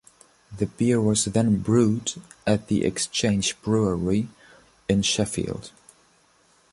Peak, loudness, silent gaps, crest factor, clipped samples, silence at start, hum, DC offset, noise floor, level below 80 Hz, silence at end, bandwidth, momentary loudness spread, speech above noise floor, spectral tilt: -6 dBFS; -24 LUFS; none; 18 dB; under 0.1%; 0.5 s; none; under 0.1%; -61 dBFS; -48 dBFS; 1.05 s; 11.5 kHz; 11 LU; 38 dB; -5 dB/octave